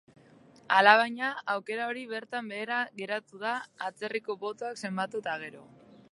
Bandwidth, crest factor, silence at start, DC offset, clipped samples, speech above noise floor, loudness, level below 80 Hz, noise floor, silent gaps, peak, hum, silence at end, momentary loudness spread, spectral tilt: 11.5 kHz; 26 dB; 0.7 s; under 0.1%; under 0.1%; 27 dB; -29 LUFS; -84 dBFS; -57 dBFS; none; -6 dBFS; none; 0.5 s; 15 LU; -4 dB/octave